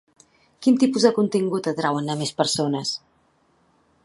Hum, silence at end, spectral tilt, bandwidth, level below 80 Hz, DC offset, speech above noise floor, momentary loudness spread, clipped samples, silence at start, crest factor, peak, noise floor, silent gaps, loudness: none; 1.1 s; -5 dB/octave; 11.5 kHz; -68 dBFS; under 0.1%; 42 dB; 8 LU; under 0.1%; 0.6 s; 20 dB; -2 dBFS; -63 dBFS; none; -22 LUFS